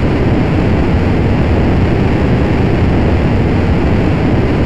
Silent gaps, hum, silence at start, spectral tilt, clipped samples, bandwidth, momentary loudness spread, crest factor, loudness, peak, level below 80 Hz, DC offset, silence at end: none; none; 0 s; -8.5 dB/octave; under 0.1%; 8.2 kHz; 1 LU; 8 dB; -12 LUFS; -2 dBFS; -18 dBFS; 6%; 0 s